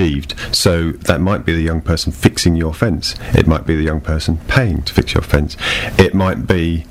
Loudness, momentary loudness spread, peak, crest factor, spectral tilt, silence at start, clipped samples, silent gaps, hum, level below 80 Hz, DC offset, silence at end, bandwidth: -15 LUFS; 5 LU; 0 dBFS; 14 dB; -5.5 dB/octave; 0 s; 0.3%; none; none; -24 dBFS; under 0.1%; 0 s; 16 kHz